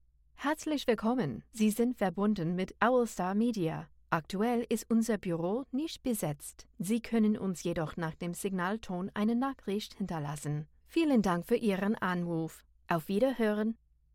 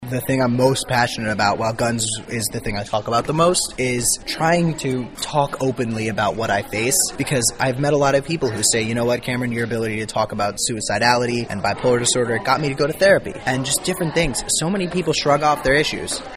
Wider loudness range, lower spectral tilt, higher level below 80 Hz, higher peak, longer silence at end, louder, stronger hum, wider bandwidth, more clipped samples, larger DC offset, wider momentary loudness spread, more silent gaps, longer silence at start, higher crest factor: about the same, 3 LU vs 2 LU; first, -6 dB/octave vs -3.5 dB/octave; second, -60 dBFS vs -42 dBFS; second, -12 dBFS vs -2 dBFS; first, 0.4 s vs 0 s; second, -32 LUFS vs -19 LUFS; neither; about the same, 16.5 kHz vs 15.5 kHz; neither; neither; about the same, 8 LU vs 6 LU; neither; first, 0.4 s vs 0 s; about the same, 20 dB vs 18 dB